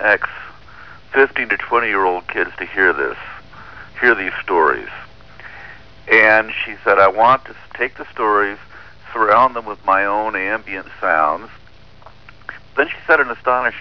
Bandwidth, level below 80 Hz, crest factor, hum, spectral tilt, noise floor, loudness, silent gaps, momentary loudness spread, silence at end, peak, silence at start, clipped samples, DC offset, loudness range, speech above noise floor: 5.4 kHz; -50 dBFS; 18 dB; 50 Hz at -60 dBFS; -6 dB/octave; -44 dBFS; -16 LUFS; none; 22 LU; 0 s; 0 dBFS; 0 s; under 0.1%; 0.8%; 5 LU; 28 dB